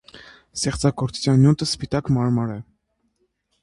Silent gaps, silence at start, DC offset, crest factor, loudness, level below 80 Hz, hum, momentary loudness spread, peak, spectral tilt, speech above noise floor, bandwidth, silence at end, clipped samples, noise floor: none; 0.15 s; under 0.1%; 18 dB; -21 LUFS; -46 dBFS; none; 12 LU; -4 dBFS; -6 dB/octave; 50 dB; 11.5 kHz; 1 s; under 0.1%; -70 dBFS